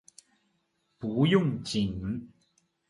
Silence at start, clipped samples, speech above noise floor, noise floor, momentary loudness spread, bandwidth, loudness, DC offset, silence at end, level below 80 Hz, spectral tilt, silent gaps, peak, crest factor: 1 s; under 0.1%; 48 dB; -75 dBFS; 14 LU; 11.5 kHz; -29 LUFS; under 0.1%; 0.65 s; -54 dBFS; -6.5 dB/octave; none; -10 dBFS; 20 dB